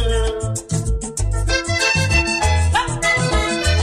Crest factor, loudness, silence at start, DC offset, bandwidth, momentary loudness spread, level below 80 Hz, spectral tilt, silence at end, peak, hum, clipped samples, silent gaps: 14 dB; -18 LUFS; 0 s; under 0.1%; 14.5 kHz; 7 LU; -24 dBFS; -4 dB/octave; 0 s; -4 dBFS; none; under 0.1%; none